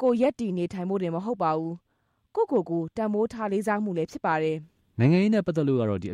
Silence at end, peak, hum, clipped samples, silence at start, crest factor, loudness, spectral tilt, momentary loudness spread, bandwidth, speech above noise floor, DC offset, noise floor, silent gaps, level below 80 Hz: 0 s; -10 dBFS; none; under 0.1%; 0 s; 16 dB; -26 LUFS; -8 dB/octave; 8 LU; 12 kHz; 29 dB; under 0.1%; -54 dBFS; none; -62 dBFS